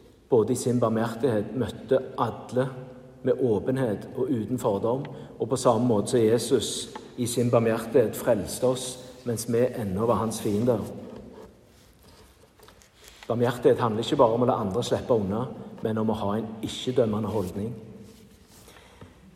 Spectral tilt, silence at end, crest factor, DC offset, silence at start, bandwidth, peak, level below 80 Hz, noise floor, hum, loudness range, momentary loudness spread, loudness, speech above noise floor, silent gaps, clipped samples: -6 dB/octave; 0.3 s; 20 dB; under 0.1%; 0.3 s; 15.5 kHz; -6 dBFS; -58 dBFS; -55 dBFS; none; 5 LU; 12 LU; -26 LUFS; 30 dB; none; under 0.1%